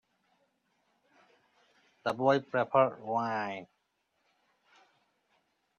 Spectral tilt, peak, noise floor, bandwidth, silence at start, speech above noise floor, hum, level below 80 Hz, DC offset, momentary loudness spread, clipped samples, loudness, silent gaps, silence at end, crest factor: -6.5 dB/octave; -10 dBFS; -78 dBFS; 9.2 kHz; 2.05 s; 49 dB; none; -80 dBFS; under 0.1%; 11 LU; under 0.1%; -30 LUFS; none; 2.15 s; 24 dB